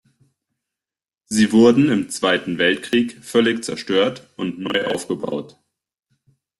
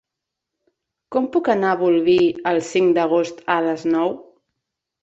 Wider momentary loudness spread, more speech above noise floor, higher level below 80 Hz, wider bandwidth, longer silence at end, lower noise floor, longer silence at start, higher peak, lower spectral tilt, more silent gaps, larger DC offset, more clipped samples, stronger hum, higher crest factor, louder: first, 13 LU vs 7 LU; first, over 72 dB vs 65 dB; about the same, -60 dBFS vs -64 dBFS; first, 12.5 kHz vs 8 kHz; first, 1.1 s vs 0.8 s; first, under -90 dBFS vs -83 dBFS; first, 1.3 s vs 1.1 s; about the same, -2 dBFS vs -2 dBFS; about the same, -4.5 dB/octave vs -5.5 dB/octave; neither; neither; neither; neither; about the same, 18 dB vs 18 dB; about the same, -19 LUFS vs -19 LUFS